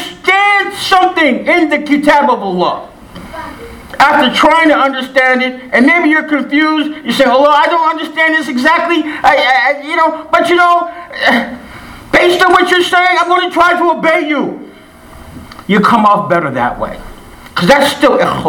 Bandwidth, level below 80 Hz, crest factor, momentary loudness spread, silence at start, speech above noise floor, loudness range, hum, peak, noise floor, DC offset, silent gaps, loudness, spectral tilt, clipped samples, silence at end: 18.5 kHz; -42 dBFS; 10 dB; 14 LU; 0 s; 25 dB; 2 LU; none; 0 dBFS; -35 dBFS; under 0.1%; none; -10 LUFS; -4.5 dB/octave; 0.4%; 0 s